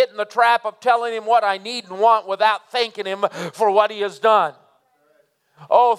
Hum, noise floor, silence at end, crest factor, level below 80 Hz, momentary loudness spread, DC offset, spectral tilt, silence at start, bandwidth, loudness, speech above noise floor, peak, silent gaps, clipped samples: none; -61 dBFS; 0 s; 18 dB; -86 dBFS; 7 LU; under 0.1%; -3 dB/octave; 0 s; 14 kHz; -19 LUFS; 43 dB; -2 dBFS; none; under 0.1%